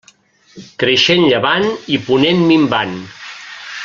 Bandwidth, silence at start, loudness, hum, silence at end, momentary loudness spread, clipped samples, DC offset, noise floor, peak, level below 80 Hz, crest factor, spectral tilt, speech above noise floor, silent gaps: 7.4 kHz; 0.55 s; -13 LUFS; none; 0 s; 19 LU; under 0.1%; under 0.1%; -50 dBFS; 0 dBFS; -54 dBFS; 16 dB; -5 dB/octave; 36 dB; none